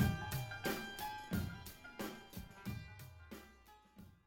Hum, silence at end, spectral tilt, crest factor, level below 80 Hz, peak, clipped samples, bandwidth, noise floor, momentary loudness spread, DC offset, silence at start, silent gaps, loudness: none; 0.1 s; -5 dB/octave; 22 dB; -56 dBFS; -22 dBFS; under 0.1%; 19 kHz; -64 dBFS; 19 LU; under 0.1%; 0 s; none; -45 LUFS